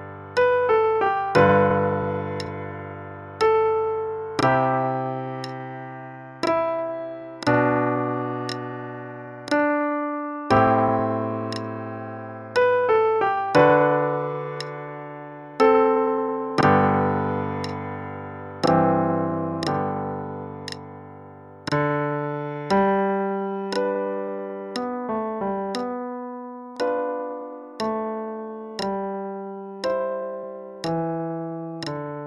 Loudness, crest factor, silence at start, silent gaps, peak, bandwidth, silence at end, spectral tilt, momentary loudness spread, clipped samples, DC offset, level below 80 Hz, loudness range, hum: -23 LUFS; 20 dB; 0 s; none; -4 dBFS; 11.5 kHz; 0 s; -7 dB/octave; 16 LU; under 0.1%; under 0.1%; -58 dBFS; 8 LU; none